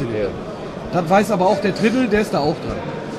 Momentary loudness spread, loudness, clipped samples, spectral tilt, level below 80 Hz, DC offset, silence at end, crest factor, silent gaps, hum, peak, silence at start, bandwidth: 11 LU; -19 LUFS; under 0.1%; -6 dB/octave; -42 dBFS; under 0.1%; 0 s; 16 dB; none; none; -2 dBFS; 0 s; 13 kHz